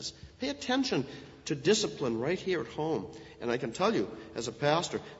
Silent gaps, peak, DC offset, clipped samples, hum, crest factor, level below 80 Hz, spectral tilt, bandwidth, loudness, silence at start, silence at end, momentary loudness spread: none; -12 dBFS; under 0.1%; under 0.1%; none; 20 dB; -62 dBFS; -4.5 dB/octave; 8 kHz; -32 LUFS; 0 s; 0 s; 11 LU